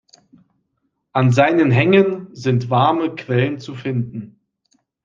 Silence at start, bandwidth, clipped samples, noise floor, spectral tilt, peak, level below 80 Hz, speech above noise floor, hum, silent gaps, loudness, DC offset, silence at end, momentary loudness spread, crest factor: 1.15 s; 7.4 kHz; under 0.1%; -71 dBFS; -7.5 dB/octave; -2 dBFS; -60 dBFS; 55 dB; none; none; -17 LUFS; under 0.1%; 0.8 s; 11 LU; 18 dB